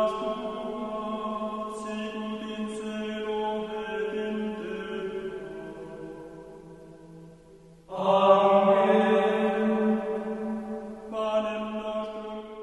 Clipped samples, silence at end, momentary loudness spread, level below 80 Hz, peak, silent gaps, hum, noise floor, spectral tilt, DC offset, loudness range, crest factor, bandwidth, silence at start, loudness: under 0.1%; 0 s; 20 LU; -60 dBFS; -6 dBFS; none; none; -52 dBFS; -6.5 dB/octave; under 0.1%; 13 LU; 22 dB; 11.5 kHz; 0 s; -28 LUFS